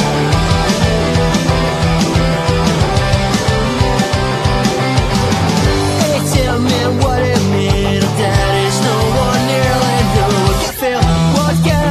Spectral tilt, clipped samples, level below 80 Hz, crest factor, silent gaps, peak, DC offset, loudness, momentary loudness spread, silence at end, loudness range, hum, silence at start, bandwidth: -5 dB/octave; under 0.1%; -24 dBFS; 12 dB; none; 0 dBFS; under 0.1%; -13 LUFS; 2 LU; 0 s; 1 LU; none; 0 s; 14 kHz